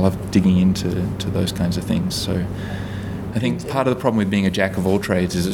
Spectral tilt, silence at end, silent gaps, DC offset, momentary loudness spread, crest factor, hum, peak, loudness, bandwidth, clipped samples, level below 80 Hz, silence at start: -6 dB/octave; 0 s; none; under 0.1%; 9 LU; 18 dB; none; -2 dBFS; -20 LUFS; 16.5 kHz; under 0.1%; -40 dBFS; 0 s